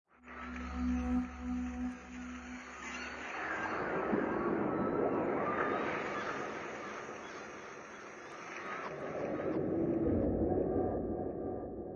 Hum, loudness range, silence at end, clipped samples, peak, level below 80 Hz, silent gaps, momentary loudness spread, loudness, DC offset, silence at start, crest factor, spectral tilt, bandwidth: none; 6 LU; 0 s; under 0.1%; -20 dBFS; -52 dBFS; none; 13 LU; -37 LUFS; under 0.1%; 0.25 s; 16 dB; -6.5 dB/octave; 7.4 kHz